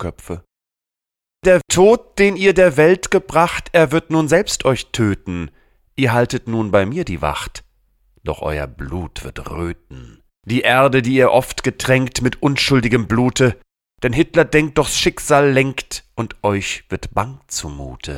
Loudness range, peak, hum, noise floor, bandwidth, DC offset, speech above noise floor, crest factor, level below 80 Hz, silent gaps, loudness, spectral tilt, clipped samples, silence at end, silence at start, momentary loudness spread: 8 LU; -2 dBFS; none; -85 dBFS; 16.5 kHz; under 0.1%; 69 dB; 16 dB; -38 dBFS; none; -16 LUFS; -5 dB/octave; under 0.1%; 0 s; 0 s; 15 LU